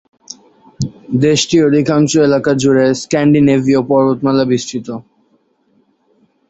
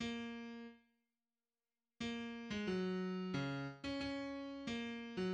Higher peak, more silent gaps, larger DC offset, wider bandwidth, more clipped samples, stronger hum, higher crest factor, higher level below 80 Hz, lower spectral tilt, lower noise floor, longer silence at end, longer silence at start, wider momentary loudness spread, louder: first, 0 dBFS vs -28 dBFS; neither; neither; about the same, 8.2 kHz vs 9 kHz; neither; neither; about the same, 14 dB vs 16 dB; first, -50 dBFS vs -70 dBFS; about the same, -5.5 dB/octave vs -6 dB/octave; second, -57 dBFS vs under -90 dBFS; first, 1.5 s vs 0 s; first, 0.3 s vs 0 s; first, 17 LU vs 8 LU; first, -13 LUFS vs -44 LUFS